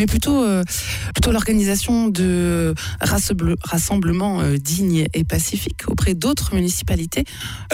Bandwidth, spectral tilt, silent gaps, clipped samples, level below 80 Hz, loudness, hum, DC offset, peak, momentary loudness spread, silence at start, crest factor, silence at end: 16.5 kHz; -5 dB/octave; none; under 0.1%; -30 dBFS; -19 LUFS; none; under 0.1%; -8 dBFS; 5 LU; 0 s; 12 dB; 0 s